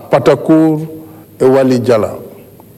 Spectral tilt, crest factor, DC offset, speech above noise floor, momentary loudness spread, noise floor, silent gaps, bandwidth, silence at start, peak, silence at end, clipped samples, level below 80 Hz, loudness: -7.5 dB/octave; 12 dB; under 0.1%; 26 dB; 18 LU; -36 dBFS; none; 14.5 kHz; 0 s; 0 dBFS; 0.45 s; under 0.1%; -50 dBFS; -11 LUFS